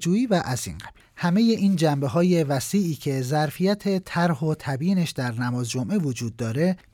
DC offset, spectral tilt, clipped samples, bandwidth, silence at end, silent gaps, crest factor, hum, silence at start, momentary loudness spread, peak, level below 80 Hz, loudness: under 0.1%; -6 dB/octave; under 0.1%; 17 kHz; 0.15 s; none; 14 dB; none; 0 s; 8 LU; -10 dBFS; -56 dBFS; -24 LUFS